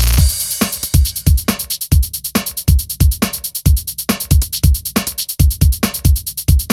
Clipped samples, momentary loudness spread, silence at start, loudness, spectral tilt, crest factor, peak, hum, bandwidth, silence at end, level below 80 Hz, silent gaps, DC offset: under 0.1%; 5 LU; 0 s; -16 LUFS; -4.5 dB/octave; 14 dB; 0 dBFS; none; 18 kHz; 0 s; -18 dBFS; none; under 0.1%